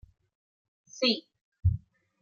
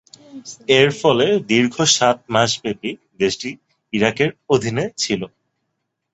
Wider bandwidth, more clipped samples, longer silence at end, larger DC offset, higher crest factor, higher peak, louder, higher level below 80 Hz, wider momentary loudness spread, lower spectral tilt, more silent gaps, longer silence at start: second, 7.2 kHz vs 8.2 kHz; neither; second, 0.45 s vs 0.85 s; neither; about the same, 20 dB vs 18 dB; second, -12 dBFS vs 0 dBFS; second, -30 LUFS vs -18 LUFS; first, -48 dBFS vs -56 dBFS; second, 12 LU vs 15 LU; first, -5.5 dB/octave vs -3.5 dB/octave; first, 1.41-1.52 s vs none; first, 0.95 s vs 0.35 s